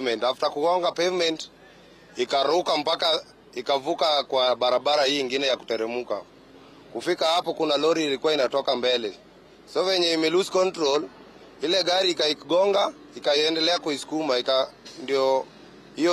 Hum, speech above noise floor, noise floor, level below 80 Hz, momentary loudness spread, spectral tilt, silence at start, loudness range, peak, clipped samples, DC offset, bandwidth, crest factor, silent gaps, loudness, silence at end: none; 27 dB; -50 dBFS; -68 dBFS; 11 LU; -3 dB/octave; 0 s; 2 LU; -12 dBFS; under 0.1%; under 0.1%; 14 kHz; 12 dB; none; -24 LUFS; 0 s